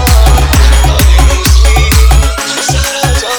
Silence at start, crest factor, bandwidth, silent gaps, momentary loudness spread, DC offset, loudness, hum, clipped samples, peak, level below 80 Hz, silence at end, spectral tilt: 0 s; 6 dB; over 20 kHz; none; 4 LU; under 0.1%; -8 LUFS; none; 2%; 0 dBFS; -8 dBFS; 0 s; -4 dB/octave